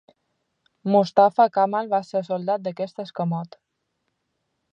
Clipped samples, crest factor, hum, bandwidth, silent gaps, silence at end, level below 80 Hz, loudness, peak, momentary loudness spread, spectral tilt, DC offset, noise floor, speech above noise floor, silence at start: under 0.1%; 20 dB; none; 7.8 kHz; none; 1.3 s; -78 dBFS; -22 LUFS; -4 dBFS; 14 LU; -7.5 dB/octave; under 0.1%; -76 dBFS; 55 dB; 0.85 s